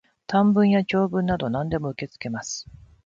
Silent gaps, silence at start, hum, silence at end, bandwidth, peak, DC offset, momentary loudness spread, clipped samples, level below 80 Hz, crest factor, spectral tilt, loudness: none; 0.3 s; none; 0.45 s; 7.6 kHz; -8 dBFS; under 0.1%; 14 LU; under 0.1%; -50 dBFS; 14 dB; -6 dB/octave; -23 LUFS